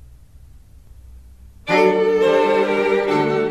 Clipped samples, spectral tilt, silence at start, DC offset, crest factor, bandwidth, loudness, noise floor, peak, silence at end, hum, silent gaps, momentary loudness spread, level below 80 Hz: under 0.1%; -6 dB/octave; 1.05 s; 0.2%; 16 dB; 12 kHz; -17 LUFS; -44 dBFS; -4 dBFS; 0 s; none; none; 3 LU; -46 dBFS